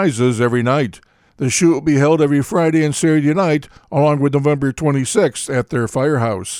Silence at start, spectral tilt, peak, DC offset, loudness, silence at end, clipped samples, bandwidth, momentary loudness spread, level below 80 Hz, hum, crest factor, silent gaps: 0 s; -6 dB/octave; -2 dBFS; under 0.1%; -16 LUFS; 0 s; under 0.1%; 14 kHz; 6 LU; -50 dBFS; none; 14 dB; none